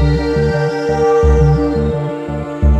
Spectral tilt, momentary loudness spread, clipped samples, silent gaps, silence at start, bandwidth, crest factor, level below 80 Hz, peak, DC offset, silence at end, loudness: -8 dB/octave; 9 LU; under 0.1%; none; 0 s; 8.4 kHz; 12 dB; -18 dBFS; -2 dBFS; under 0.1%; 0 s; -15 LUFS